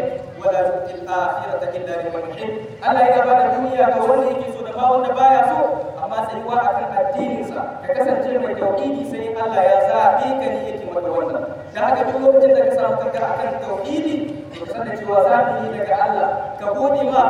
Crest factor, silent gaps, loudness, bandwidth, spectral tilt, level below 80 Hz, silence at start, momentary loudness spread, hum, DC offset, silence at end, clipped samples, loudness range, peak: 16 dB; none; -19 LUFS; 10.5 kHz; -6.5 dB/octave; -58 dBFS; 0 s; 11 LU; none; under 0.1%; 0 s; under 0.1%; 4 LU; -2 dBFS